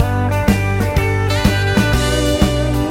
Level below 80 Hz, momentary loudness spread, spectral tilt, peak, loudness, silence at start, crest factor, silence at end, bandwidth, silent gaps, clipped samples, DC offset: -22 dBFS; 2 LU; -5.5 dB/octave; 0 dBFS; -16 LUFS; 0 s; 14 dB; 0 s; 16.5 kHz; none; under 0.1%; under 0.1%